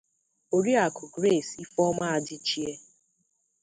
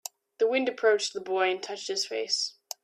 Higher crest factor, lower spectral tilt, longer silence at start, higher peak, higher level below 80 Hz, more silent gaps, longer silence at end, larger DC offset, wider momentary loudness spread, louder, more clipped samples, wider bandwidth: about the same, 18 dB vs 16 dB; first, -4.5 dB/octave vs -1 dB/octave; about the same, 0.5 s vs 0.4 s; about the same, -10 dBFS vs -12 dBFS; first, -68 dBFS vs -82 dBFS; neither; first, 0.85 s vs 0.35 s; neither; about the same, 9 LU vs 8 LU; about the same, -27 LUFS vs -28 LUFS; neither; second, 9.6 kHz vs 15 kHz